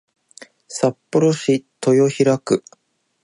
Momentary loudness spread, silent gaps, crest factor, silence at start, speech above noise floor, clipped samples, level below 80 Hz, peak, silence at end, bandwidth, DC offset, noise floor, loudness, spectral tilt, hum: 6 LU; none; 16 dB; 0.7 s; 29 dB; under 0.1%; -66 dBFS; -4 dBFS; 0.65 s; 11.5 kHz; under 0.1%; -46 dBFS; -18 LUFS; -6 dB/octave; none